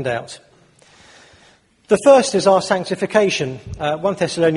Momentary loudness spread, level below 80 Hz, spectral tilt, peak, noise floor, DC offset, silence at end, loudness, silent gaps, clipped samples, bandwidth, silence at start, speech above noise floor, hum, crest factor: 13 LU; -50 dBFS; -4.5 dB/octave; 0 dBFS; -53 dBFS; under 0.1%; 0 s; -17 LUFS; none; under 0.1%; 11.5 kHz; 0 s; 36 dB; none; 18 dB